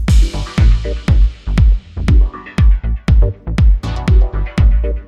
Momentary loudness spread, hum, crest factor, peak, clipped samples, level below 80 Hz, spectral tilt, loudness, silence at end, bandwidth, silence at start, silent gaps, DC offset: 4 LU; none; 12 dB; 0 dBFS; under 0.1%; -12 dBFS; -7 dB/octave; -15 LUFS; 0.05 s; 9.2 kHz; 0 s; none; under 0.1%